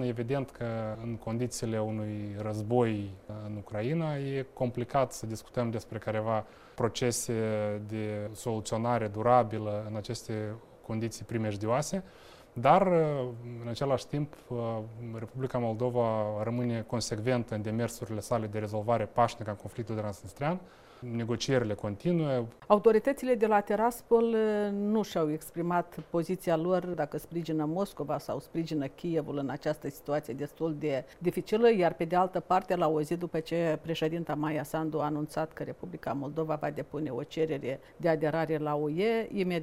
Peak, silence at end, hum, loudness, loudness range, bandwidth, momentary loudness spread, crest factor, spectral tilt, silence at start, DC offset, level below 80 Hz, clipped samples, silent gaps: -8 dBFS; 0 s; none; -31 LUFS; 5 LU; 16 kHz; 11 LU; 22 dB; -6 dB/octave; 0 s; under 0.1%; -60 dBFS; under 0.1%; none